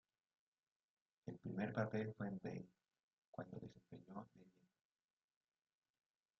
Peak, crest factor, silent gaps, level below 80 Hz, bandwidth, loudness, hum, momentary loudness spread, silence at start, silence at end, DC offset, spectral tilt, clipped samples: -26 dBFS; 26 dB; 3.03-3.33 s; -82 dBFS; 6.6 kHz; -49 LUFS; none; 16 LU; 1.25 s; 1.9 s; under 0.1%; -7.5 dB/octave; under 0.1%